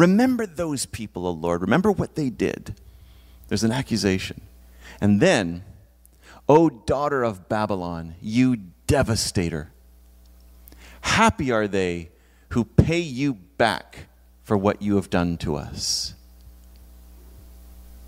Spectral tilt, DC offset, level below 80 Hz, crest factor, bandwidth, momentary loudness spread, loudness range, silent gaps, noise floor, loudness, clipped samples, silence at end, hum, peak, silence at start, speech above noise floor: -5.5 dB/octave; under 0.1%; -44 dBFS; 22 dB; 16 kHz; 13 LU; 4 LU; none; -52 dBFS; -23 LUFS; under 0.1%; 0 s; none; -2 dBFS; 0 s; 30 dB